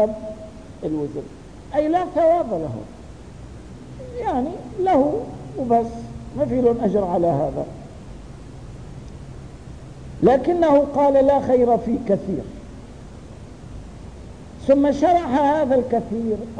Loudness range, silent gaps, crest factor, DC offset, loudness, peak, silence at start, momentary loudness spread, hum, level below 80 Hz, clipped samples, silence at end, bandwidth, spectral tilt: 6 LU; none; 16 dB; 0.3%; -20 LUFS; -6 dBFS; 0 s; 23 LU; none; -42 dBFS; under 0.1%; 0 s; 10 kHz; -8 dB/octave